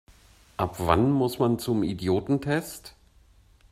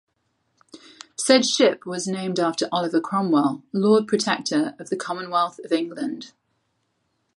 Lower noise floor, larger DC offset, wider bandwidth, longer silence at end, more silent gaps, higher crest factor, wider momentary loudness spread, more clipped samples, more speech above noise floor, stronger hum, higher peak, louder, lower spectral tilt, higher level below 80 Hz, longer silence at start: second, -58 dBFS vs -72 dBFS; neither; first, 16 kHz vs 11.5 kHz; second, 0.8 s vs 1.1 s; neither; about the same, 22 dB vs 22 dB; about the same, 13 LU vs 11 LU; neither; second, 33 dB vs 50 dB; neither; about the same, -4 dBFS vs -2 dBFS; second, -26 LUFS vs -22 LUFS; first, -6.5 dB/octave vs -4 dB/octave; first, -50 dBFS vs -74 dBFS; second, 0.6 s vs 0.75 s